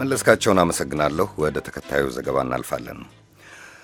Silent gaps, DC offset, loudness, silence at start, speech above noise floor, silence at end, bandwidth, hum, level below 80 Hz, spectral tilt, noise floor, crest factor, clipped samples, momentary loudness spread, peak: none; under 0.1%; -22 LUFS; 0 s; 24 dB; 0.1 s; 17.5 kHz; none; -46 dBFS; -4.5 dB/octave; -45 dBFS; 22 dB; under 0.1%; 13 LU; 0 dBFS